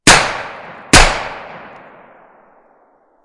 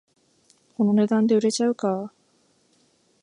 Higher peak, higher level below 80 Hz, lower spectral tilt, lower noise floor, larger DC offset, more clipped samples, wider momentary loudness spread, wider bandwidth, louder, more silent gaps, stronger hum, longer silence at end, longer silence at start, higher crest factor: first, 0 dBFS vs -10 dBFS; first, -24 dBFS vs -74 dBFS; second, -2 dB/octave vs -6 dB/octave; second, -53 dBFS vs -64 dBFS; neither; first, 0.6% vs under 0.1%; first, 24 LU vs 14 LU; about the same, 12 kHz vs 11 kHz; first, -11 LUFS vs -22 LUFS; neither; neither; first, 1.65 s vs 1.15 s; second, 0.05 s vs 0.8 s; about the same, 16 dB vs 14 dB